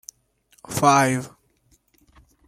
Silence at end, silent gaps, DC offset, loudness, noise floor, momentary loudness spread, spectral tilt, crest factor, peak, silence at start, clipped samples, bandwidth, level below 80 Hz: 1.2 s; none; under 0.1%; -20 LUFS; -63 dBFS; 25 LU; -4.5 dB/octave; 22 dB; -4 dBFS; 0.7 s; under 0.1%; 16 kHz; -60 dBFS